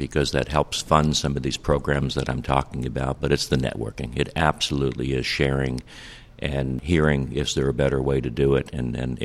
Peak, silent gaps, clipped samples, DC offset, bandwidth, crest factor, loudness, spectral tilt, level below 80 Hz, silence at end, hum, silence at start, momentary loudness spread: -2 dBFS; none; under 0.1%; under 0.1%; 14 kHz; 22 dB; -24 LUFS; -5.5 dB/octave; -36 dBFS; 0 s; none; 0 s; 8 LU